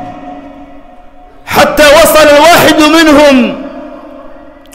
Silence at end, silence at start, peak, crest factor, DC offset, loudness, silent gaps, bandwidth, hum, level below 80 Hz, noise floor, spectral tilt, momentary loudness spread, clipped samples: 0.4 s; 0 s; 0 dBFS; 8 dB; under 0.1%; -4 LUFS; none; 16.5 kHz; none; -32 dBFS; -32 dBFS; -3 dB/octave; 22 LU; 0.3%